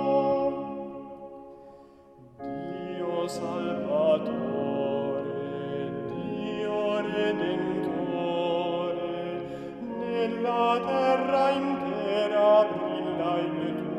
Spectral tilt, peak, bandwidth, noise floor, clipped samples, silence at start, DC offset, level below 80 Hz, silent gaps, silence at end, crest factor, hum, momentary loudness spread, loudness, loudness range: -6.5 dB/octave; -10 dBFS; 10.5 kHz; -52 dBFS; under 0.1%; 0 s; under 0.1%; -64 dBFS; none; 0 s; 18 dB; none; 12 LU; -28 LUFS; 7 LU